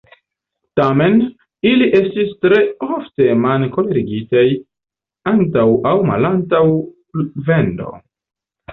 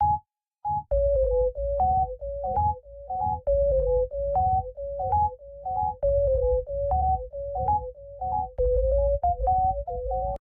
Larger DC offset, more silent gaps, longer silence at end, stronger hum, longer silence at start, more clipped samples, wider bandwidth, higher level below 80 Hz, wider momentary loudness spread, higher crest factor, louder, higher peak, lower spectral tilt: neither; neither; about the same, 0 s vs 0.1 s; neither; first, 0.75 s vs 0 s; neither; first, 5.2 kHz vs 1.7 kHz; second, -50 dBFS vs -34 dBFS; about the same, 10 LU vs 8 LU; about the same, 14 dB vs 12 dB; first, -15 LUFS vs -26 LUFS; first, -2 dBFS vs -14 dBFS; second, -9.5 dB/octave vs -12 dB/octave